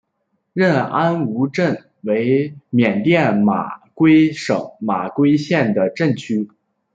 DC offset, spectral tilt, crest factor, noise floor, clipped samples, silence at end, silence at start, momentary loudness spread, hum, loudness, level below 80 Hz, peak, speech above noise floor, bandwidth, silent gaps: under 0.1%; -7.5 dB/octave; 16 dB; -70 dBFS; under 0.1%; 0.5 s; 0.55 s; 9 LU; none; -17 LUFS; -60 dBFS; -2 dBFS; 54 dB; 7.8 kHz; none